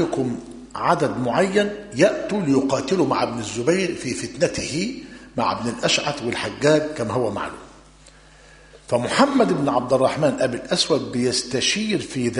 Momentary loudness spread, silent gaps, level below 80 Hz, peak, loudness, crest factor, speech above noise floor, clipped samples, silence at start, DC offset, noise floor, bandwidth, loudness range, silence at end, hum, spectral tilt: 8 LU; none; -52 dBFS; -2 dBFS; -21 LUFS; 20 dB; 27 dB; under 0.1%; 0 s; under 0.1%; -48 dBFS; 11 kHz; 3 LU; 0 s; none; -4.5 dB/octave